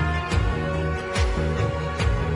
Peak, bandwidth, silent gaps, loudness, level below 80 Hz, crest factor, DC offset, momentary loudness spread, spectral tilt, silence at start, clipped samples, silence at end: -10 dBFS; 11 kHz; none; -25 LUFS; -28 dBFS; 12 dB; under 0.1%; 2 LU; -6 dB/octave; 0 s; under 0.1%; 0 s